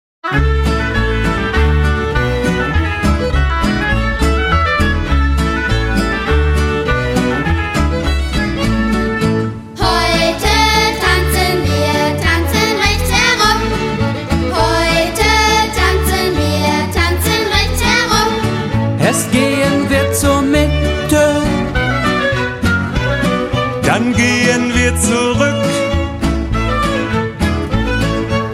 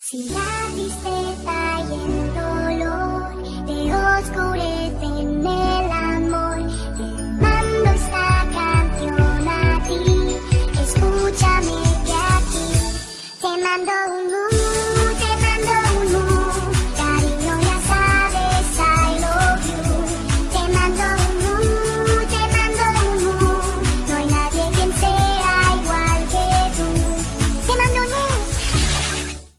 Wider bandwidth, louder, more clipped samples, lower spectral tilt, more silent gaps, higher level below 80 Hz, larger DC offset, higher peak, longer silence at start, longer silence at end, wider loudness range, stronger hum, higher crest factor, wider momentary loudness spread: first, 16.5 kHz vs 14 kHz; first, -14 LUFS vs -19 LUFS; neither; about the same, -4.5 dB/octave vs -4.5 dB/octave; neither; about the same, -20 dBFS vs -24 dBFS; neither; first, 0 dBFS vs -4 dBFS; first, 0.25 s vs 0 s; about the same, 0 s vs 0.1 s; about the same, 3 LU vs 4 LU; neither; about the same, 14 dB vs 14 dB; about the same, 5 LU vs 7 LU